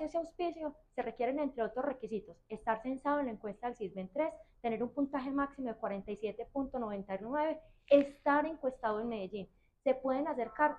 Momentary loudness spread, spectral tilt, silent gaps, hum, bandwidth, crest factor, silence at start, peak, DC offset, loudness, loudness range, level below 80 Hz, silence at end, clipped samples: 10 LU; -7 dB/octave; none; none; 9.4 kHz; 22 dB; 0 s; -14 dBFS; under 0.1%; -36 LUFS; 4 LU; -64 dBFS; 0 s; under 0.1%